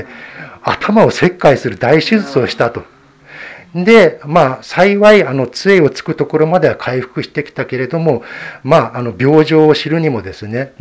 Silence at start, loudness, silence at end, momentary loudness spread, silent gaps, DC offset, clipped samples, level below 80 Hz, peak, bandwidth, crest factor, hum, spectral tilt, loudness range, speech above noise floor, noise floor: 0 s; -12 LUFS; 0.1 s; 14 LU; none; under 0.1%; 0.5%; -48 dBFS; 0 dBFS; 8 kHz; 12 dB; none; -6.5 dB/octave; 4 LU; 25 dB; -37 dBFS